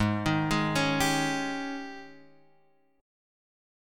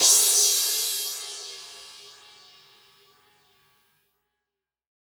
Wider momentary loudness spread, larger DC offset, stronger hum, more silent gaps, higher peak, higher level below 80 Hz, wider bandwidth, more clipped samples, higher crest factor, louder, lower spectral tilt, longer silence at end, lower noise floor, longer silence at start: second, 14 LU vs 27 LU; neither; neither; neither; second, -12 dBFS vs -4 dBFS; first, -52 dBFS vs -82 dBFS; second, 17.5 kHz vs over 20 kHz; neither; second, 18 dB vs 24 dB; second, -28 LUFS vs -20 LUFS; first, -4.5 dB/octave vs 3.5 dB/octave; second, 1 s vs 2.95 s; second, -67 dBFS vs -87 dBFS; about the same, 0 s vs 0 s